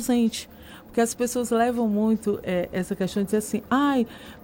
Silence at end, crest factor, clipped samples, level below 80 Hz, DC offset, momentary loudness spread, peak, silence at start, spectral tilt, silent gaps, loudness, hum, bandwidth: 0.05 s; 16 dB; under 0.1%; -54 dBFS; under 0.1%; 8 LU; -10 dBFS; 0 s; -5 dB/octave; none; -25 LUFS; none; 17 kHz